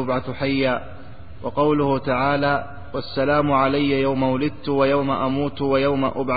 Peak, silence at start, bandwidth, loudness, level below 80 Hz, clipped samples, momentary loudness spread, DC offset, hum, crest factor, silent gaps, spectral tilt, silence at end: -6 dBFS; 0 s; 4.9 kHz; -21 LUFS; -46 dBFS; under 0.1%; 9 LU; 2%; none; 14 dB; none; -11.5 dB/octave; 0 s